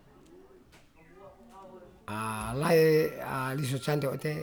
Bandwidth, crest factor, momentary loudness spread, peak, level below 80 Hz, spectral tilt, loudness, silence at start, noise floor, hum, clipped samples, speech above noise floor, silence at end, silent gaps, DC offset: over 20 kHz; 18 dB; 26 LU; -14 dBFS; -58 dBFS; -6 dB/octave; -29 LUFS; 0.3 s; -57 dBFS; none; under 0.1%; 29 dB; 0 s; none; under 0.1%